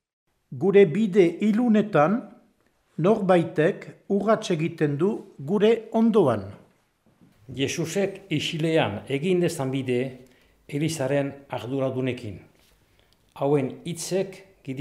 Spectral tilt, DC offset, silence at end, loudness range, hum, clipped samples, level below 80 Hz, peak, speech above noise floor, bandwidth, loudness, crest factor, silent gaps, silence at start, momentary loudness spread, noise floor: -6 dB/octave; under 0.1%; 0 s; 7 LU; none; under 0.1%; -68 dBFS; -6 dBFS; 42 dB; 15.5 kHz; -24 LUFS; 18 dB; none; 0.5 s; 14 LU; -65 dBFS